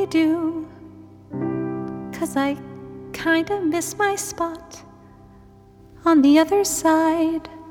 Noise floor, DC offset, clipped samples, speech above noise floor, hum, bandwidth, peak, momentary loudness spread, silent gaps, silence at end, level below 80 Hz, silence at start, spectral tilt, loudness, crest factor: -48 dBFS; under 0.1%; under 0.1%; 28 dB; none; 18.5 kHz; -4 dBFS; 19 LU; none; 0 s; -54 dBFS; 0 s; -4 dB/octave; -21 LUFS; 18 dB